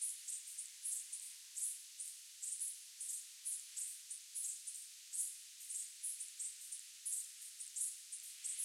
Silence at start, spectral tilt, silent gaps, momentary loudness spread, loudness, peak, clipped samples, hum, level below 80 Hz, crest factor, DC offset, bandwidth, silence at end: 0 s; 9.5 dB/octave; none; 6 LU; -44 LUFS; -28 dBFS; under 0.1%; none; under -90 dBFS; 20 dB; under 0.1%; 16.5 kHz; 0 s